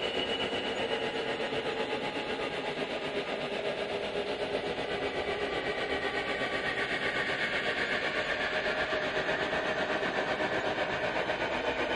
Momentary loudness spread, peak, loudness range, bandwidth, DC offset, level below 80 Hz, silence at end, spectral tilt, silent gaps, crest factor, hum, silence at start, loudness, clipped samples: 4 LU; -18 dBFS; 3 LU; 11.5 kHz; under 0.1%; -58 dBFS; 0 s; -4 dB/octave; none; 16 dB; none; 0 s; -32 LUFS; under 0.1%